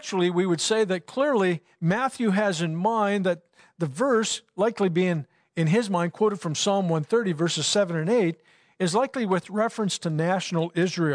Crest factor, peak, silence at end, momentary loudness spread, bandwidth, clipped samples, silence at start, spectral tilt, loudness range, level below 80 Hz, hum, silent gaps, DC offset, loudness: 14 dB; -12 dBFS; 0 s; 5 LU; 10.5 kHz; under 0.1%; 0 s; -5 dB/octave; 1 LU; -74 dBFS; none; none; under 0.1%; -25 LUFS